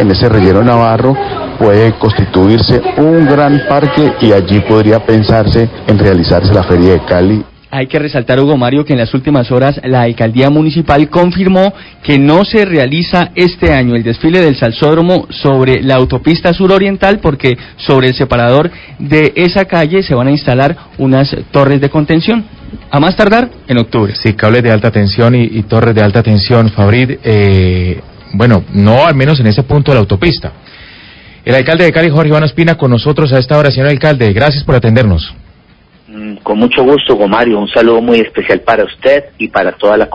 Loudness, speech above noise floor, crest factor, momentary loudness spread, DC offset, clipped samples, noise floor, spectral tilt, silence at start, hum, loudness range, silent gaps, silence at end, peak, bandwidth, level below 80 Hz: -9 LUFS; 35 dB; 8 dB; 5 LU; under 0.1%; 2%; -43 dBFS; -8.5 dB/octave; 0 s; none; 2 LU; none; 0 s; 0 dBFS; 8 kHz; -28 dBFS